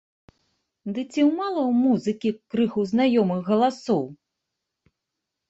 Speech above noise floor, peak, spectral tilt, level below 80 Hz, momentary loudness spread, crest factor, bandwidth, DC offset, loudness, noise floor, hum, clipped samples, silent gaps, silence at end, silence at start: 61 dB; -10 dBFS; -7 dB/octave; -68 dBFS; 10 LU; 16 dB; 8 kHz; under 0.1%; -23 LUFS; -83 dBFS; none; under 0.1%; none; 1.35 s; 0.85 s